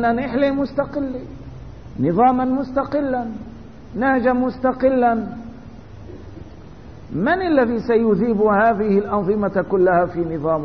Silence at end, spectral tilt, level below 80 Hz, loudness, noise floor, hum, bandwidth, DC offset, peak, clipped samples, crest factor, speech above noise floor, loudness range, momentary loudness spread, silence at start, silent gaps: 0 s; -9.5 dB/octave; -44 dBFS; -19 LUFS; -39 dBFS; none; 6.2 kHz; 0.6%; -2 dBFS; under 0.1%; 16 dB; 21 dB; 4 LU; 22 LU; 0 s; none